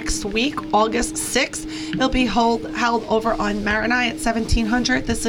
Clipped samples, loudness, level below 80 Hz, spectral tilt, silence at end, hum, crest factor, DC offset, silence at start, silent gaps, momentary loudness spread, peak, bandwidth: under 0.1%; -20 LUFS; -32 dBFS; -3.5 dB/octave; 0 s; none; 14 dB; under 0.1%; 0 s; none; 4 LU; -6 dBFS; 17.5 kHz